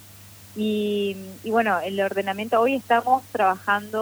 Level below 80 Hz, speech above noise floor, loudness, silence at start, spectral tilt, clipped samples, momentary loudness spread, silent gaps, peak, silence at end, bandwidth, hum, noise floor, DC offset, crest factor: -66 dBFS; 23 dB; -23 LUFS; 0 s; -5 dB/octave; under 0.1%; 8 LU; none; -8 dBFS; 0 s; over 20 kHz; none; -46 dBFS; under 0.1%; 16 dB